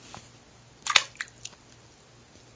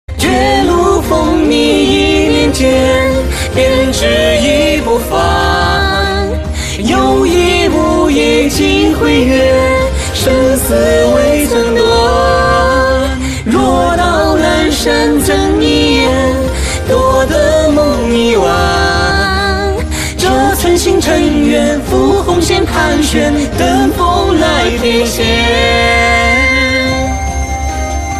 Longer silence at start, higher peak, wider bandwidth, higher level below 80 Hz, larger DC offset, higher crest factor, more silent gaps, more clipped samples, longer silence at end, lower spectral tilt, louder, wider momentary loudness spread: about the same, 0.1 s vs 0.1 s; about the same, 0 dBFS vs 0 dBFS; second, 8 kHz vs 14 kHz; second, -64 dBFS vs -20 dBFS; neither; first, 34 dB vs 10 dB; neither; neither; first, 1.05 s vs 0 s; second, 1 dB/octave vs -4.5 dB/octave; second, -26 LUFS vs -10 LUFS; first, 23 LU vs 4 LU